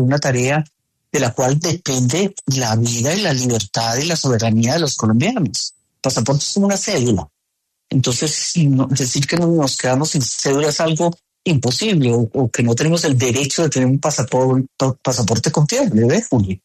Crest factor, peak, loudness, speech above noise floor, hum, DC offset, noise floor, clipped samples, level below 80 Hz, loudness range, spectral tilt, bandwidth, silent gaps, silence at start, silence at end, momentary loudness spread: 12 dB; -4 dBFS; -17 LUFS; 58 dB; none; under 0.1%; -74 dBFS; under 0.1%; -50 dBFS; 2 LU; -4.5 dB/octave; 13.5 kHz; none; 0 s; 0.1 s; 4 LU